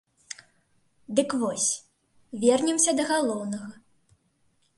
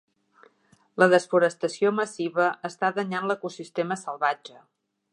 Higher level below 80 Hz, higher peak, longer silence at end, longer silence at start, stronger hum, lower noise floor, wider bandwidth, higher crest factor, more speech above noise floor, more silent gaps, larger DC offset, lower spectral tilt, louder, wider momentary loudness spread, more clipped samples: first, -72 dBFS vs -82 dBFS; second, -8 dBFS vs -4 dBFS; first, 1.05 s vs 0.65 s; second, 0.3 s vs 0.95 s; neither; first, -68 dBFS vs -61 dBFS; about the same, 11.5 kHz vs 11 kHz; about the same, 22 dB vs 22 dB; first, 43 dB vs 37 dB; neither; neither; second, -2.5 dB/octave vs -5 dB/octave; about the same, -25 LUFS vs -25 LUFS; first, 20 LU vs 11 LU; neither